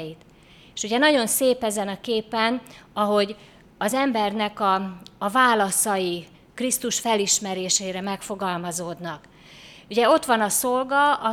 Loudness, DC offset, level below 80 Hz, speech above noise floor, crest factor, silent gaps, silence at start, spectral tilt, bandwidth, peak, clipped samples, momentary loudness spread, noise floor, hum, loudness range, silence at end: -22 LUFS; under 0.1%; -62 dBFS; 24 dB; 18 dB; none; 0 s; -2.5 dB/octave; 19.5 kHz; -4 dBFS; under 0.1%; 14 LU; -47 dBFS; none; 3 LU; 0 s